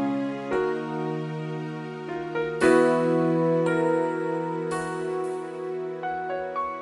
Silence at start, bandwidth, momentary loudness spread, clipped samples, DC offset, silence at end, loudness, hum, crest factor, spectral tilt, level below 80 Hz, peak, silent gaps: 0 s; 11.5 kHz; 12 LU; under 0.1%; under 0.1%; 0 s; -26 LUFS; none; 18 dB; -7 dB/octave; -62 dBFS; -8 dBFS; none